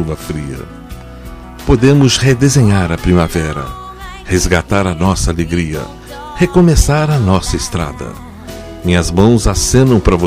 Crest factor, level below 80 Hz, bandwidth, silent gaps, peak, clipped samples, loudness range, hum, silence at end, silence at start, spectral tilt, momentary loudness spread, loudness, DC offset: 12 dB; -22 dBFS; 15.5 kHz; none; 0 dBFS; under 0.1%; 3 LU; none; 0 s; 0 s; -5.5 dB/octave; 20 LU; -12 LUFS; under 0.1%